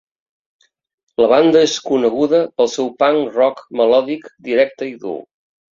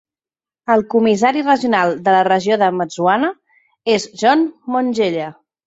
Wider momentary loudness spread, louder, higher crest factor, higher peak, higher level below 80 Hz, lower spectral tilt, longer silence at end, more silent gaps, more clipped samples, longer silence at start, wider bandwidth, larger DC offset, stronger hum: first, 14 LU vs 7 LU; about the same, -16 LUFS vs -16 LUFS; about the same, 16 dB vs 16 dB; about the same, -2 dBFS vs -2 dBFS; about the same, -60 dBFS vs -62 dBFS; about the same, -4.5 dB/octave vs -5 dB/octave; first, 0.55 s vs 0.35 s; neither; neither; first, 1.2 s vs 0.7 s; about the same, 7.6 kHz vs 8 kHz; neither; neither